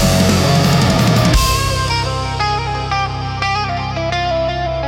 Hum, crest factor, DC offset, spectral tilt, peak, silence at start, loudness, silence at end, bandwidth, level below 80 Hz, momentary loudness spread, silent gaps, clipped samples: none; 12 dB; under 0.1%; -5 dB/octave; -2 dBFS; 0 s; -15 LUFS; 0 s; 17.5 kHz; -26 dBFS; 7 LU; none; under 0.1%